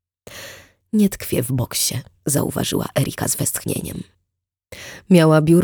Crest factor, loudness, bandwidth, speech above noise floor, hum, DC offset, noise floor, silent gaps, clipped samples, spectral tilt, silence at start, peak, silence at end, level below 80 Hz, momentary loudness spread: 18 dB; -19 LUFS; over 20 kHz; 61 dB; none; under 0.1%; -79 dBFS; none; under 0.1%; -5 dB/octave; 0.3 s; -2 dBFS; 0 s; -48 dBFS; 22 LU